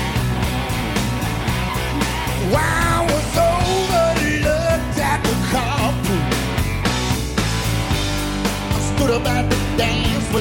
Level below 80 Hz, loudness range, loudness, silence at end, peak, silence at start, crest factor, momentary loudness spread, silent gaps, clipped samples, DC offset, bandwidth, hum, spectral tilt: -28 dBFS; 2 LU; -19 LUFS; 0 s; -6 dBFS; 0 s; 12 dB; 4 LU; none; under 0.1%; under 0.1%; 17 kHz; none; -5 dB/octave